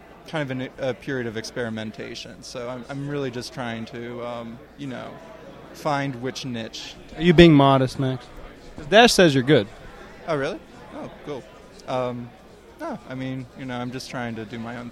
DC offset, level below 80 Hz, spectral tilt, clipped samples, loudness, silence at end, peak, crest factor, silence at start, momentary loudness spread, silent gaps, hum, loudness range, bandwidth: under 0.1%; -46 dBFS; -5.5 dB/octave; under 0.1%; -22 LUFS; 0 s; 0 dBFS; 24 dB; 0 s; 23 LU; none; none; 15 LU; 14 kHz